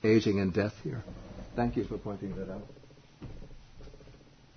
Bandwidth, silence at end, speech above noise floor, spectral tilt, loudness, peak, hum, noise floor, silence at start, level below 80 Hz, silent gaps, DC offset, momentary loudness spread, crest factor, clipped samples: 6.6 kHz; 0.4 s; 25 dB; -7.5 dB/octave; -32 LUFS; -14 dBFS; none; -55 dBFS; 0 s; -50 dBFS; none; under 0.1%; 24 LU; 20 dB; under 0.1%